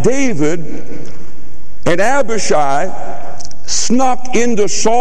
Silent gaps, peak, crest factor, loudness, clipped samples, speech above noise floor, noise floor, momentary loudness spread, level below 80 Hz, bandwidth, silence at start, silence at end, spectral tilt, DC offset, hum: none; 0 dBFS; 14 dB; -15 LUFS; under 0.1%; 22 dB; -37 dBFS; 17 LU; -40 dBFS; 13 kHz; 0 s; 0 s; -4 dB/octave; 40%; none